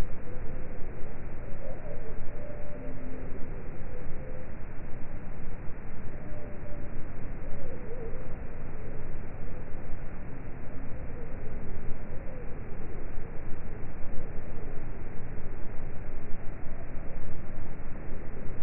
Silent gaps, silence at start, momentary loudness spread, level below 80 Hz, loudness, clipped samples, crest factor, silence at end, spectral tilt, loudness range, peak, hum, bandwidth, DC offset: none; 0 s; 2 LU; -34 dBFS; -42 LUFS; under 0.1%; 12 dB; 0 s; -6 dB/octave; 1 LU; -12 dBFS; none; 2.7 kHz; under 0.1%